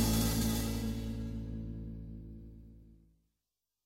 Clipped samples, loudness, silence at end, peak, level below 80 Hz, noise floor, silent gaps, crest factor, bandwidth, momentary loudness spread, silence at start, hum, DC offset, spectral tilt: under 0.1%; -36 LUFS; 0.9 s; -20 dBFS; -44 dBFS; -89 dBFS; none; 18 dB; 16.5 kHz; 22 LU; 0 s; none; under 0.1%; -5 dB/octave